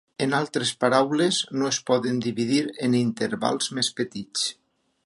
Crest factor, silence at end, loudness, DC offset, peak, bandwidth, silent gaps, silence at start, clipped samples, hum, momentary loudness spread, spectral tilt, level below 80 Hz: 20 dB; 0.55 s; -24 LUFS; under 0.1%; -4 dBFS; 11.5 kHz; none; 0.2 s; under 0.1%; none; 6 LU; -4 dB/octave; -70 dBFS